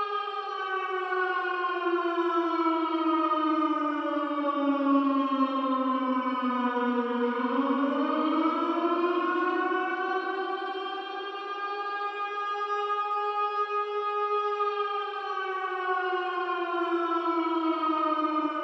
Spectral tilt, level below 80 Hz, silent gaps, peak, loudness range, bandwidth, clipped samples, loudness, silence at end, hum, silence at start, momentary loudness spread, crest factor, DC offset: -4.5 dB/octave; under -90 dBFS; none; -12 dBFS; 4 LU; 6.2 kHz; under 0.1%; -28 LUFS; 0 s; none; 0 s; 6 LU; 16 dB; under 0.1%